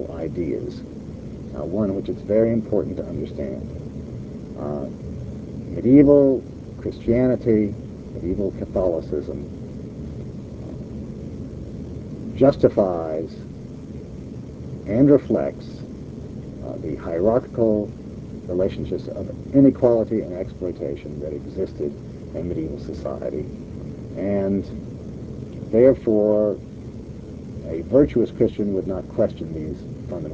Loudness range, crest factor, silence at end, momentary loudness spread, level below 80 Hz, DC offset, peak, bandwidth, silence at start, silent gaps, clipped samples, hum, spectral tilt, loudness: 9 LU; 20 dB; 0 s; 19 LU; -42 dBFS; 0.1%; -2 dBFS; 8 kHz; 0 s; none; under 0.1%; none; -10 dB/octave; -22 LUFS